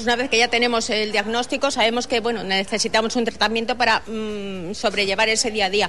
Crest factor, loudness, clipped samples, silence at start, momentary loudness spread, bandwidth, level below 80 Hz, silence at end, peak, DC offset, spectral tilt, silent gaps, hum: 16 dB; -20 LUFS; under 0.1%; 0 s; 7 LU; 12 kHz; -48 dBFS; 0 s; -4 dBFS; 1%; -2 dB/octave; none; none